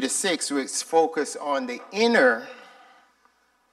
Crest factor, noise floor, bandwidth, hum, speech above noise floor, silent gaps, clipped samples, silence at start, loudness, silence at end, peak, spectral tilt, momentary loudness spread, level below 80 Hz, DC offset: 18 dB; -64 dBFS; 14 kHz; none; 40 dB; none; under 0.1%; 0 s; -23 LUFS; 1.1 s; -6 dBFS; -2 dB/octave; 11 LU; -78 dBFS; under 0.1%